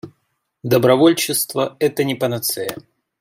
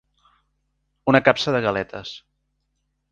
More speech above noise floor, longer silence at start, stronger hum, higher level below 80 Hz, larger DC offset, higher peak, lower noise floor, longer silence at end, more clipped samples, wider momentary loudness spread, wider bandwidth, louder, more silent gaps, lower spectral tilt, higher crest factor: about the same, 53 dB vs 53 dB; second, 0.05 s vs 1.05 s; neither; second, -62 dBFS vs -56 dBFS; neither; about the same, -2 dBFS vs 0 dBFS; about the same, -70 dBFS vs -73 dBFS; second, 0.4 s vs 0.95 s; neither; second, 14 LU vs 19 LU; first, 16 kHz vs 9.2 kHz; about the same, -18 LUFS vs -20 LUFS; neither; about the same, -4.5 dB/octave vs -5.5 dB/octave; second, 18 dB vs 24 dB